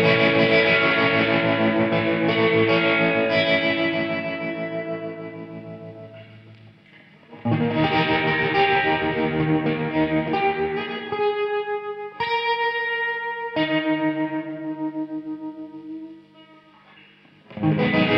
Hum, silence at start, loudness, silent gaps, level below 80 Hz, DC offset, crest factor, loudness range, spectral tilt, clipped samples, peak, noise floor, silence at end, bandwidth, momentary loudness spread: none; 0 s; -21 LUFS; none; -54 dBFS; under 0.1%; 18 dB; 12 LU; -7.5 dB/octave; under 0.1%; -6 dBFS; -52 dBFS; 0 s; 6 kHz; 18 LU